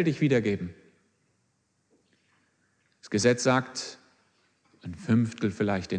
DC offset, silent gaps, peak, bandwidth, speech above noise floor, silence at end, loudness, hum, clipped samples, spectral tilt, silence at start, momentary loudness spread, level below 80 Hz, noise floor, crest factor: under 0.1%; none; -8 dBFS; 10 kHz; 47 dB; 0 s; -27 LUFS; none; under 0.1%; -5.5 dB/octave; 0 s; 17 LU; -64 dBFS; -73 dBFS; 22 dB